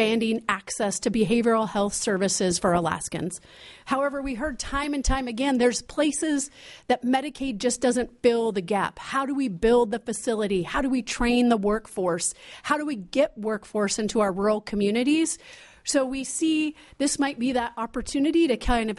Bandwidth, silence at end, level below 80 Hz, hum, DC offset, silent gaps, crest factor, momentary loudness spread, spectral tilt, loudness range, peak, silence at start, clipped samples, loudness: 11.5 kHz; 0 s; -42 dBFS; none; under 0.1%; none; 18 dB; 7 LU; -4 dB/octave; 2 LU; -8 dBFS; 0 s; under 0.1%; -25 LUFS